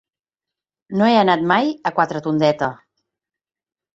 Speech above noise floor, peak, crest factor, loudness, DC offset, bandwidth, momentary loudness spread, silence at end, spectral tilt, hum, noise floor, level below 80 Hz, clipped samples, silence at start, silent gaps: 71 dB; -2 dBFS; 18 dB; -18 LUFS; under 0.1%; 7.8 kHz; 9 LU; 1.2 s; -6.5 dB/octave; none; -88 dBFS; -62 dBFS; under 0.1%; 0.9 s; none